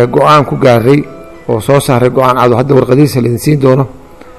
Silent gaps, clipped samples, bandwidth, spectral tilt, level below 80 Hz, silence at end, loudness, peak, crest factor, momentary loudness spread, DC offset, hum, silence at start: none; 3%; 14 kHz; -7 dB/octave; -38 dBFS; 0.1 s; -9 LUFS; 0 dBFS; 8 dB; 9 LU; 0.9%; none; 0 s